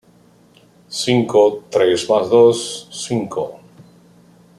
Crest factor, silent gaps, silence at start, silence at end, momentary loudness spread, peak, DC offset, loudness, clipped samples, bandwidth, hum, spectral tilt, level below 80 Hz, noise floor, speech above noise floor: 16 dB; none; 0.9 s; 1 s; 14 LU; -2 dBFS; under 0.1%; -16 LUFS; under 0.1%; 12.5 kHz; none; -4.5 dB/octave; -62 dBFS; -51 dBFS; 35 dB